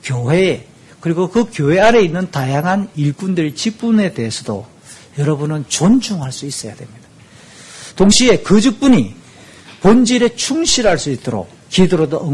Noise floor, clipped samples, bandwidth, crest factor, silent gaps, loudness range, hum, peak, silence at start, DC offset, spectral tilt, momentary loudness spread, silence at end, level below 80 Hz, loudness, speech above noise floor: -42 dBFS; under 0.1%; 12 kHz; 14 dB; none; 6 LU; none; 0 dBFS; 0 s; under 0.1%; -5 dB/octave; 14 LU; 0 s; -40 dBFS; -15 LUFS; 28 dB